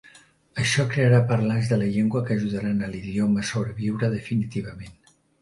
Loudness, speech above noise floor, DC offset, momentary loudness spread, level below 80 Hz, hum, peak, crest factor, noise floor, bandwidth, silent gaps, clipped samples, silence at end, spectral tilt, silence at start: -24 LUFS; 31 dB; under 0.1%; 12 LU; -52 dBFS; none; -6 dBFS; 18 dB; -54 dBFS; 11.5 kHz; none; under 0.1%; 0.5 s; -6.5 dB/octave; 0.55 s